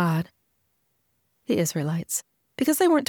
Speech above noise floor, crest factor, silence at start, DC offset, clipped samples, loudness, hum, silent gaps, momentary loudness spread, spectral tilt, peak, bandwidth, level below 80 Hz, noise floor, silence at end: 49 dB; 16 dB; 0 s; under 0.1%; under 0.1%; -25 LUFS; none; none; 18 LU; -5 dB/octave; -10 dBFS; over 20 kHz; -66 dBFS; -72 dBFS; 0.05 s